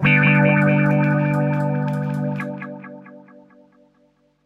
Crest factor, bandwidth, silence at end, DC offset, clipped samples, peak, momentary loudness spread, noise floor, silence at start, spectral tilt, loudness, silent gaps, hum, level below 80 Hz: 18 dB; 4.1 kHz; 1.25 s; under 0.1%; under 0.1%; -2 dBFS; 19 LU; -60 dBFS; 0 s; -9 dB/octave; -18 LUFS; none; none; -56 dBFS